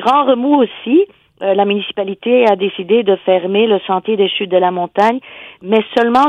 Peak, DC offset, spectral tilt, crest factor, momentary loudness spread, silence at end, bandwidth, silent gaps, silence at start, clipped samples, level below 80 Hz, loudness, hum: 0 dBFS; under 0.1%; -6.5 dB/octave; 14 dB; 8 LU; 0 s; 9 kHz; none; 0 s; under 0.1%; -62 dBFS; -14 LUFS; none